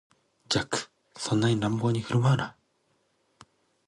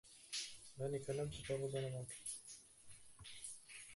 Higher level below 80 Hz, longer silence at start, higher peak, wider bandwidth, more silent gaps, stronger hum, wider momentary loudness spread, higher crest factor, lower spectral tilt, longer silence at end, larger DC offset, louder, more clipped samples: first, -60 dBFS vs -70 dBFS; first, 0.5 s vs 0.05 s; first, -8 dBFS vs -30 dBFS; about the same, 11.5 kHz vs 12 kHz; neither; neither; second, 11 LU vs 15 LU; about the same, 20 dB vs 18 dB; first, -5.5 dB/octave vs -4 dB/octave; first, 1.35 s vs 0 s; neither; first, -27 LUFS vs -47 LUFS; neither